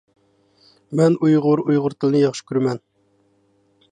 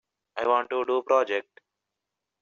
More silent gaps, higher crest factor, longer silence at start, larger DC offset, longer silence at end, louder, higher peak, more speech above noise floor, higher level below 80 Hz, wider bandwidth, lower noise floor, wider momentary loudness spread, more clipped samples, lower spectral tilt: neither; about the same, 16 dB vs 18 dB; first, 0.9 s vs 0.35 s; neither; first, 1.15 s vs 1 s; first, -19 LUFS vs -26 LUFS; first, -6 dBFS vs -10 dBFS; second, 44 dB vs 60 dB; first, -70 dBFS vs -76 dBFS; first, 9.8 kHz vs 7 kHz; second, -62 dBFS vs -86 dBFS; about the same, 8 LU vs 8 LU; neither; first, -7.5 dB/octave vs -0.5 dB/octave